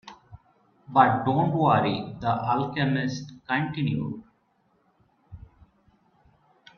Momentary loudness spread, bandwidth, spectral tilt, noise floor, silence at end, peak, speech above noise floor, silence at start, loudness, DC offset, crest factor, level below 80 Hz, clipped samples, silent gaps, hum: 12 LU; 6.8 kHz; -7 dB/octave; -68 dBFS; 1.4 s; -4 dBFS; 43 dB; 0.05 s; -25 LUFS; under 0.1%; 24 dB; -60 dBFS; under 0.1%; none; none